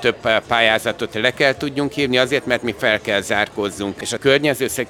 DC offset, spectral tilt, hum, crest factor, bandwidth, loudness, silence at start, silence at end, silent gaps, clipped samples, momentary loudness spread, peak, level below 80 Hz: under 0.1%; -3.5 dB/octave; none; 18 dB; 19.5 kHz; -18 LUFS; 0 s; 0 s; none; under 0.1%; 7 LU; 0 dBFS; -52 dBFS